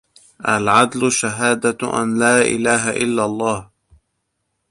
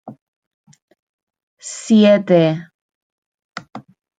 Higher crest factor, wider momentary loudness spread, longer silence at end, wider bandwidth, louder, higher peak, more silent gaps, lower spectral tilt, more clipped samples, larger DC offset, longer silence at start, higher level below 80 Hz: about the same, 18 dB vs 18 dB; second, 7 LU vs 24 LU; first, 1.05 s vs 0.4 s; first, 11.5 kHz vs 9.4 kHz; second, -17 LUFS vs -14 LUFS; about the same, -2 dBFS vs -2 dBFS; second, none vs 0.21-0.64 s, 0.82-0.88 s, 0.99-1.27 s, 1.43-1.57 s, 2.74-2.89 s, 2.95-3.38 s, 3.44-3.49 s; second, -3.5 dB/octave vs -6 dB/octave; neither; neither; first, 0.4 s vs 0.05 s; first, -54 dBFS vs -66 dBFS